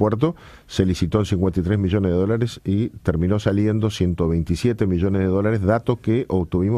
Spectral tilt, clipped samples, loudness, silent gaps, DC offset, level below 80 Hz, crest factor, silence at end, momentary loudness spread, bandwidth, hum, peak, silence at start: -8 dB/octave; under 0.1%; -21 LUFS; none; under 0.1%; -38 dBFS; 16 dB; 0 s; 3 LU; 12.5 kHz; none; -4 dBFS; 0 s